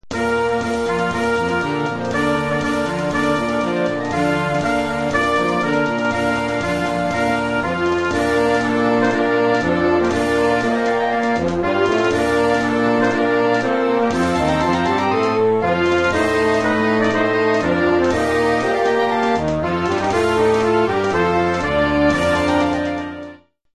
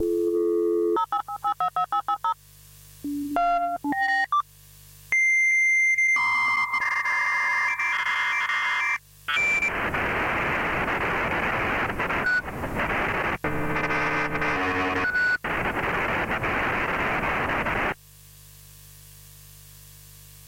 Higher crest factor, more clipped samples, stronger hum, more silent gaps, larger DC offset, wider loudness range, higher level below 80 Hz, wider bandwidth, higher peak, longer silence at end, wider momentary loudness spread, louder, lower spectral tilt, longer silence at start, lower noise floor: about the same, 14 dB vs 12 dB; neither; second, none vs 50 Hz at -60 dBFS; neither; neither; second, 2 LU vs 6 LU; first, -40 dBFS vs -46 dBFS; second, 12.5 kHz vs 16.5 kHz; first, -4 dBFS vs -12 dBFS; first, 0.4 s vs 0 s; second, 4 LU vs 8 LU; first, -18 LUFS vs -24 LUFS; first, -5.5 dB/octave vs -4 dB/octave; about the same, 0.05 s vs 0 s; second, -40 dBFS vs -50 dBFS